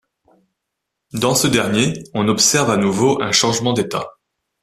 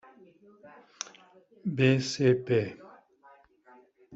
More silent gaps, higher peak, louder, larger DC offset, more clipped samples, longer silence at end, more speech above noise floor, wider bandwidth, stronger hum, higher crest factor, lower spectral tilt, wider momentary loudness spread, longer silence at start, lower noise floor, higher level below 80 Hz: neither; first, 0 dBFS vs -10 dBFS; first, -16 LUFS vs -27 LUFS; neither; neither; first, 0.5 s vs 0 s; first, 62 dB vs 31 dB; first, 14.5 kHz vs 8 kHz; neither; about the same, 18 dB vs 22 dB; second, -3.5 dB/octave vs -6 dB/octave; second, 10 LU vs 17 LU; first, 1.15 s vs 0.65 s; first, -78 dBFS vs -59 dBFS; first, -52 dBFS vs -68 dBFS